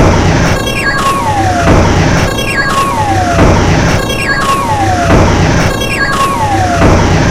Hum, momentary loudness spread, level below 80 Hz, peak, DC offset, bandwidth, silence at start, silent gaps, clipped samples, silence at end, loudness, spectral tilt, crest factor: none; 3 LU; -18 dBFS; 0 dBFS; 4%; 16 kHz; 0 s; none; 0.6%; 0 s; -9 LUFS; -5 dB/octave; 8 dB